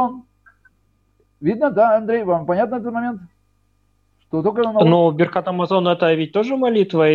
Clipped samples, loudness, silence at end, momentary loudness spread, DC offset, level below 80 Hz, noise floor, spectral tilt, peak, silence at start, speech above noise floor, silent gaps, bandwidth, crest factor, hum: under 0.1%; -18 LUFS; 0 s; 10 LU; under 0.1%; -60 dBFS; -63 dBFS; -8.5 dB/octave; -2 dBFS; 0 s; 46 dB; none; 7 kHz; 16 dB; none